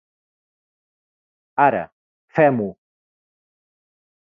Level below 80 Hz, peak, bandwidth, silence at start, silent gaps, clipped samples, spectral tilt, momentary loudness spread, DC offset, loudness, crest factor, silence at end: -66 dBFS; -4 dBFS; 5.6 kHz; 1.55 s; 1.92-2.28 s; under 0.1%; -9.5 dB/octave; 12 LU; under 0.1%; -20 LUFS; 22 dB; 1.6 s